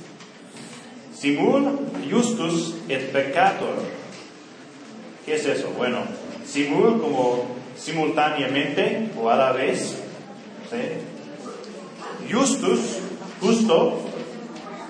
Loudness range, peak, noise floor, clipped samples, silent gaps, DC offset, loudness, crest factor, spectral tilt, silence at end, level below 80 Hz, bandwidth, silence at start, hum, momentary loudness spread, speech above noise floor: 4 LU; -4 dBFS; -43 dBFS; under 0.1%; none; under 0.1%; -23 LUFS; 20 dB; -4.5 dB/octave; 0 s; -76 dBFS; 10 kHz; 0 s; none; 20 LU; 22 dB